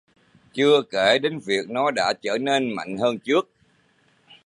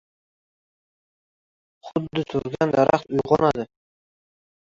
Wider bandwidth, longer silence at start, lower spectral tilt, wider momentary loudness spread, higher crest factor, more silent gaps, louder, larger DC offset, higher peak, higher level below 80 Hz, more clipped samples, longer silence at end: first, 11 kHz vs 7.6 kHz; second, 0.55 s vs 1.85 s; second, -4 dB/octave vs -7 dB/octave; second, 7 LU vs 10 LU; about the same, 18 dB vs 22 dB; neither; about the same, -22 LUFS vs -22 LUFS; neither; second, -6 dBFS vs -2 dBFS; second, -68 dBFS vs -56 dBFS; neither; about the same, 1 s vs 1 s